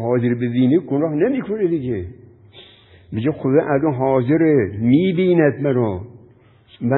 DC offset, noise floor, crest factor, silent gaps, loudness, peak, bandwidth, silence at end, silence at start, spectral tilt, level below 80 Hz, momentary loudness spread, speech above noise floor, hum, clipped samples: under 0.1%; -50 dBFS; 16 dB; none; -18 LUFS; -2 dBFS; 4.1 kHz; 0 s; 0 s; -13 dB/octave; -48 dBFS; 10 LU; 32 dB; none; under 0.1%